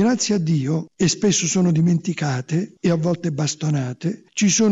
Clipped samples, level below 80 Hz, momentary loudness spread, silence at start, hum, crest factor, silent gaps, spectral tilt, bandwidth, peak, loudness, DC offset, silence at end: under 0.1%; -58 dBFS; 7 LU; 0 s; none; 12 dB; none; -5 dB/octave; 8.2 kHz; -8 dBFS; -20 LUFS; under 0.1%; 0 s